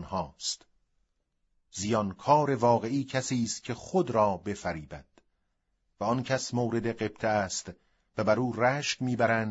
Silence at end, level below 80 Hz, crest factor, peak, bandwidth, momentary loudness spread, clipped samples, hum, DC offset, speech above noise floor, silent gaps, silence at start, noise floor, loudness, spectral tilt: 0 s; -60 dBFS; 20 dB; -10 dBFS; 8 kHz; 11 LU; under 0.1%; none; under 0.1%; 48 dB; none; 0 s; -77 dBFS; -29 LUFS; -5 dB/octave